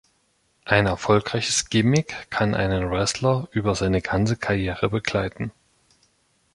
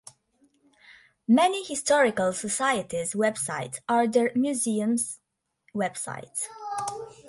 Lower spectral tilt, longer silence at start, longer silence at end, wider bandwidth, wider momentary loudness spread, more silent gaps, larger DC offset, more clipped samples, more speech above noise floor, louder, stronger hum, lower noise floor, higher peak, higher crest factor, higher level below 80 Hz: first, -5 dB/octave vs -3.5 dB/octave; second, 0.65 s vs 0.9 s; first, 1.05 s vs 0 s; about the same, 11.5 kHz vs 11.5 kHz; second, 6 LU vs 11 LU; neither; neither; neither; about the same, 44 dB vs 43 dB; first, -22 LUFS vs -26 LUFS; neither; about the same, -66 dBFS vs -68 dBFS; first, -2 dBFS vs -10 dBFS; about the same, 22 dB vs 18 dB; first, -42 dBFS vs -70 dBFS